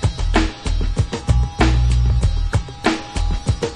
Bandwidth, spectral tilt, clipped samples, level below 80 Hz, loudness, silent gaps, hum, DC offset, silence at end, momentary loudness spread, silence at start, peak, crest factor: 10.5 kHz; -6 dB/octave; under 0.1%; -20 dBFS; -20 LUFS; none; none; under 0.1%; 0 s; 6 LU; 0 s; -2 dBFS; 16 dB